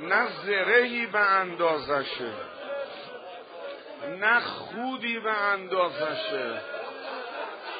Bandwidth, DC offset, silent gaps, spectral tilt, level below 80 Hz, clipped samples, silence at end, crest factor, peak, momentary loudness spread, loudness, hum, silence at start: 5 kHz; under 0.1%; none; -0.5 dB/octave; -72 dBFS; under 0.1%; 0 s; 20 dB; -8 dBFS; 17 LU; -27 LUFS; none; 0 s